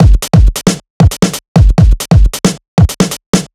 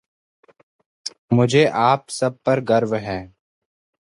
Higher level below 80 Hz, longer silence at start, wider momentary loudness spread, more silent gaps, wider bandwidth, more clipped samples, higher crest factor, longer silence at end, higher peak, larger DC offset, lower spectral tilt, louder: first, -12 dBFS vs -56 dBFS; second, 0 s vs 1.05 s; second, 6 LU vs 17 LU; first, 0.90-1.00 s, 1.48-1.55 s, 2.68-2.77 s, 3.26-3.33 s vs 1.18-1.28 s; first, 15 kHz vs 11.5 kHz; first, 5% vs under 0.1%; second, 8 dB vs 20 dB; second, 0.1 s vs 0.8 s; about the same, 0 dBFS vs -2 dBFS; neither; about the same, -6 dB/octave vs -6 dB/octave; first, -11 LUFS vs -19 LUFS